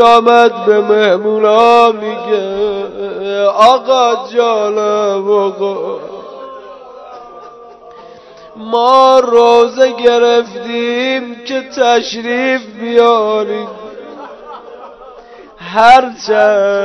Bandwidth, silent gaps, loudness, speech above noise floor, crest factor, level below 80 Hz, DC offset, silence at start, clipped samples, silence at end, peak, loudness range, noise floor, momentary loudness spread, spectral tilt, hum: 11 kHz; none; -11 LUFS; 25 dB; 12 dB; -54 dBFS; under 0.1%; 0 s; 1%; 0 s; 0 dBFS; 7 LU; -36 dBFS; 23 LU; -3.5 dB/octave; none